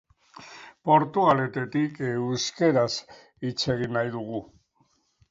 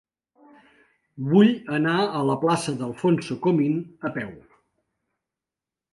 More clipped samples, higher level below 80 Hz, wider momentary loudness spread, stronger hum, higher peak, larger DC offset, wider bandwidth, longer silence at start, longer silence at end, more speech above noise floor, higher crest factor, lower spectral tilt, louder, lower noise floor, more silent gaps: neither; about the same, -62 dBFS vs -66 dBFS; about the same, 13 LU vs 13 LU; neither; about the same, -6 dBFS vs -6 dBFS; neither; second, 7.8 kHz vs 11.5 kHz; second, 0.4 s vs 1.15 s; second, 0.85 s vs 1.55 s; second, 43 dB vs 67 dB; about the same, 22 dB vs 20 dB; about the same, -5.5 dB/octave vs -6.5 dB/octave; about the same, -25 LUFS vs -23 LUFS; second, -68 dBFS vs -89 dBFS; neither